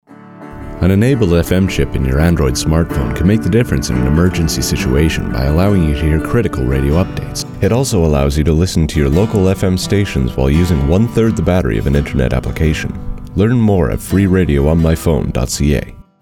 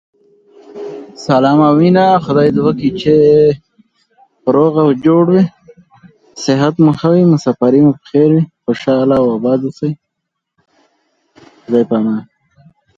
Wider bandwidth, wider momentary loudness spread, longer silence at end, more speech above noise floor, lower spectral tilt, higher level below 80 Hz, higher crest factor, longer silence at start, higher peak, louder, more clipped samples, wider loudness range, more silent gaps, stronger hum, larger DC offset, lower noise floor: first, 17 kHz vs 7.8 kHz; second, 5 LU vs 12 LU; second, 0.2 s vs 0.75 s; second, 21 dB vs 65 dB; second, -6.5 dB/octave vs -8 dB/octave; first, -22 dBFS vs -50 dBFS; about the same, 12 dB vs 12 dB; second, 0.1 s vs 0.75 s; about the same, -2 dBFS vs 0 dBFS; about the same, -14 LUFS vs -12 LUFS; neither; second, 1 LU vs 6 LU; neither; neither; neither; second, -34 dBFS vs -75 dBFS